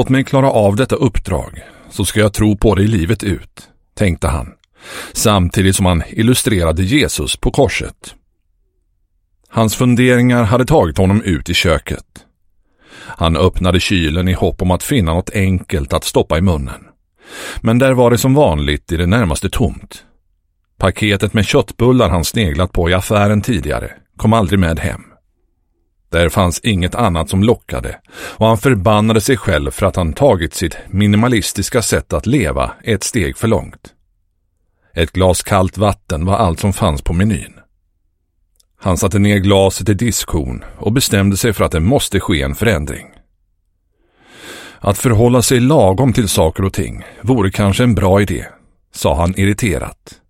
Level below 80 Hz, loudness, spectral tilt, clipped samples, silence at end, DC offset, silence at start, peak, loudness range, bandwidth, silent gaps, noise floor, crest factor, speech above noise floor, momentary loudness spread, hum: -28 dBFS; -14 LUFS; -5.5 dB/octave; under 0.1%; 0.2 s; under 0.1%; 0 s; 0 dBFS; 4 LU; 16.5 kHz; none; -63 dBFS; 14 dB; 49 dB; 11 LU; none